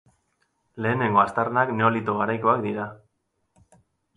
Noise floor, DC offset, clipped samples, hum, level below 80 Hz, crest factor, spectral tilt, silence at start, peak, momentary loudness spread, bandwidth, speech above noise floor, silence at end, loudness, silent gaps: -74 dBFS; under 0.1%; under 0.1%; none; -64 dBFS; 20 dB; -8 dB/octave; 0.75 s; -6 dBFS; 9 LU; 10.5 kHz; 51 dB; 1.2 s; -23 LUFS; none